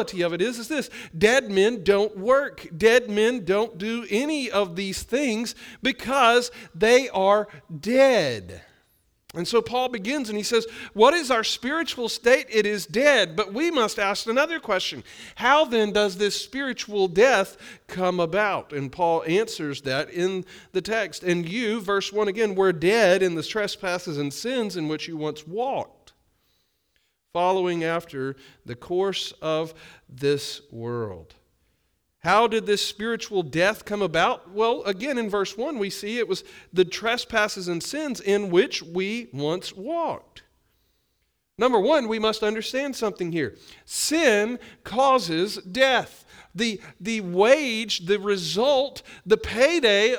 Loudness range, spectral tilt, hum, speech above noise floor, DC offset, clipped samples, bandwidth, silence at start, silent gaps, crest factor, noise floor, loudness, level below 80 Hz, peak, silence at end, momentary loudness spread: 7 LU; -4 dB/octave; none; 49 dB; under 0.1%; under 0.1%; over 20 kHz; 0 s; none; 20 dB; -73 dBFS; -23 LUFS; -56 dBFS; -4 dBFS; 0 s; 12 LU